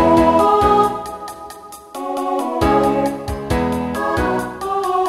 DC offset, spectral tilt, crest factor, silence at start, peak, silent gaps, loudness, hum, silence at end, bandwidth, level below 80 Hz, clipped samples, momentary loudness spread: under 0.1%; -6 dB/octave; 16 dB; 0 s; -2 dBFS; none; -17 LUFS; none; 0 s; 16 kHz; -34 dBFS; under 0.1%; 18 LU